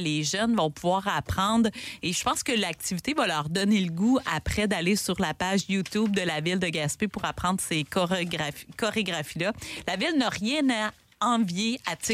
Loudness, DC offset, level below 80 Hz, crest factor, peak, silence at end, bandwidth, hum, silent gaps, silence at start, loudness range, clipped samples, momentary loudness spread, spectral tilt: -27 LUFS; under 0.1%; -50 dBFS; 14 dB; -12 dBFS; 0 s; 16 kHz; none; none; 0 s; 2 LU; under 0.1%; 5 LU; -4 dB/octave